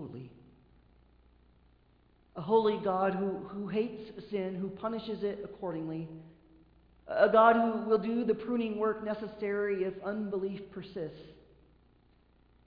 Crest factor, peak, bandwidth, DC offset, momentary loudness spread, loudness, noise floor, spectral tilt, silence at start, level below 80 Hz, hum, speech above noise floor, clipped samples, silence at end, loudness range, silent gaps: 24 dB; -10 dBFS; 5.2 kHz; under 0.1%; 17 LU; -32 LUFS; -66 dBFS; -5 dB/octave; 0 s; -66 dBFS; 60 Hz at -65 dBFS; 34 dB; under 0.1%; 1.35 s; 9 LU; none